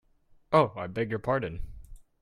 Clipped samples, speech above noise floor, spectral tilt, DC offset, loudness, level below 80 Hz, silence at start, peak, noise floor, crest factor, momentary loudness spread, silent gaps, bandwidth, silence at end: under 0.1%; 34 dB; -7.5 dB/octave; under 0.1%; -29 LUFS; -48 dBFS; 0.5 s; -8 dBFS; -61 dBFS; 22 dB; 17 LU; none; 11.5 kHz; 0.2 s